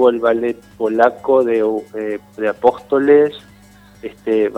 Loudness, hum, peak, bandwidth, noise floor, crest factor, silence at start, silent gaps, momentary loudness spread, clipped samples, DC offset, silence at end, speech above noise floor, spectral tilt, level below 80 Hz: -16 LUFS; 50 Hz at -50 dBFS; 0 dBFS; 8.4 kHz; -45 dBFS; 16 dB; 0 s; none; 13 LU; under 0.1%; under 0.1%; 0 s; 29 dB; -6.5 dB/octave; -56 dBFS